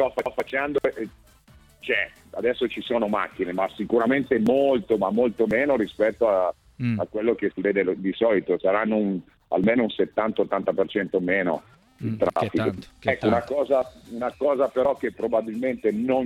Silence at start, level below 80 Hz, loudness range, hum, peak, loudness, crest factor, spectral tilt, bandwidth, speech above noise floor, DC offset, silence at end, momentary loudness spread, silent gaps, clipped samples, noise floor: 0 s; -56 dBFS; 3 LU; none; -6 dBFS; -24 LUFS; 18 dB; -7.5 dB/octave; 13.5 kHz; 30 dB; under 0.1%; 0 s; 7 LU; none; under 0.1%; -54 dBFS